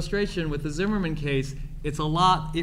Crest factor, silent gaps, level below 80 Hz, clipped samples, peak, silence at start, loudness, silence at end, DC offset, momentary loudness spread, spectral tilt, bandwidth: 18 dB; none; -36 dBFS; under 0.1%; -8 dBFS; 0 s; -26 LUFS; 0 s; under 0.1%; 11 LU; -5.5 dB/octave; 13.5 kHz